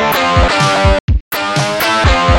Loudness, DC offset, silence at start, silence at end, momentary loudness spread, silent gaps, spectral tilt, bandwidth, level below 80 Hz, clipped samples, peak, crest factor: -12 LUFS; under 0.1%; 0 s; 0 s; 5 LU; 1.00-1.08 s, 1.21-1.31 s; -4.5 dB/octave; 19 kHz; -18 dBFS; under 0.1%; 0 dBFS; 10 dB